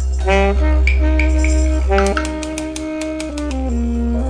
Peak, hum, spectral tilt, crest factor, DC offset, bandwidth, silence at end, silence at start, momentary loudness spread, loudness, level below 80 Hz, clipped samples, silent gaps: 0 dBFS; none; -6 dB/octave; 16 dB; under 0.1%; 10.5 kHz; 0 s; 0 s; 8 LU; -17 LUFS; -18 dBFS; under 0.1%; none